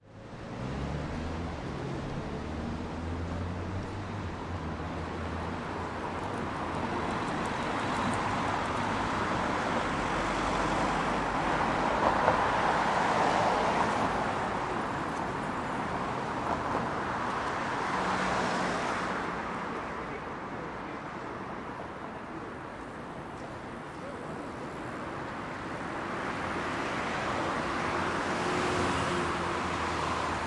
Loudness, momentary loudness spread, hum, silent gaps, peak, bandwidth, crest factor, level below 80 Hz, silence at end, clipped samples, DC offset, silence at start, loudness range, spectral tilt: -32 LUFS; 12 LU; none; none; -8 dBFS; 11.5 kHz; 24 dB; -50 dBFS; 0 s; under 0.1%; under 0.1%; 0.05 s; 11 LU; -5 dB/octave